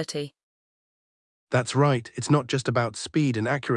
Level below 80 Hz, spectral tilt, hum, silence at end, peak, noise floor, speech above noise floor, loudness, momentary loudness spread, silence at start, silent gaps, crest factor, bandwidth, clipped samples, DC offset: -66 dBFS; -5.5 dB/octave; none; 0 s; -8 dBFS; under -90 dBFS; over 66 dB; -25 LUFS; 8 LU; 0 s; 0.43-1.47 s; 18 dB; 11.5 kHz; under 0.1%; under 0.1%